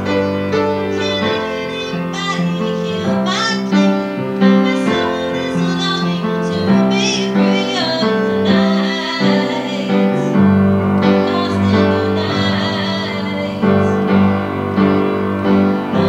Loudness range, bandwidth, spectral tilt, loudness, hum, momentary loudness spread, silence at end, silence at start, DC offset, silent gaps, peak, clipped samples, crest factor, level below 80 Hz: 3 LU; 9 kHz; -6 dB/octave; -15 LUFS; none; 6 LU; 0 s; 0 s; under 0.1%; none; 0 dBFS; under 0.1%; 14 dB; -52 dBFS